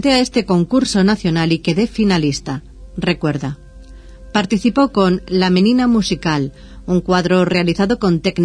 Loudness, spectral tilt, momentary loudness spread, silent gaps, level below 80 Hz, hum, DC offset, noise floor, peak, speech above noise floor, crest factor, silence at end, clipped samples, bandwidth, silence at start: -16 LUFS; -6 dB/octave; 10 LU; none; -38 dBFS; none; under 0.1%; -37 dBFS; 0 dBFS; 22 dB; 16 dB; 0 s; under 0.1%; 10.5 kHz; 0 s